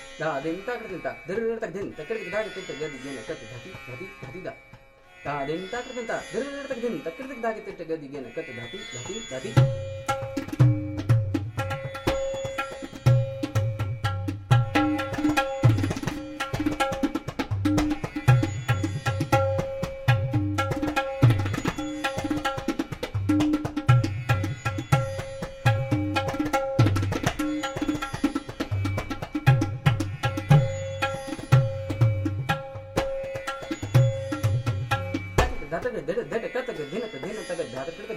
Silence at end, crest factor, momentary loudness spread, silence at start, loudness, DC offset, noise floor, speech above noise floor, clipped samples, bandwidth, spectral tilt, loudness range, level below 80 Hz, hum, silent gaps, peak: 0 s; 22 dB; 12 LU; 0 s; -27 LUFS; under 0.1%; -51 dBFS; 20 dB; under 0.1%; 15.5 kHz; -6.5 dB/octave; 8 LU; -44 dBFS; none; none; -4 dBFS